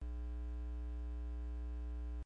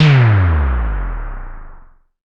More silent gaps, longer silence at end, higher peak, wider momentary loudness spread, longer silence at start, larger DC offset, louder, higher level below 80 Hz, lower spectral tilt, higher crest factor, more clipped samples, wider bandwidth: neither; second, 0 s vs 0.6 s; second, -38 dBFS vs 0 dBFS; second, 0 LU vs 22 LU; about the same, 0 s vs 0 s; neither; second, -46 LUFS vs -15 LUFS; second, -42 dBFS vs -22 dBFS; about the same, -9 dB/octave vs -8 dB/octave; second, 4 dB vs 14 dB; neither; second, 3.7 kHz vs 7.2 kHz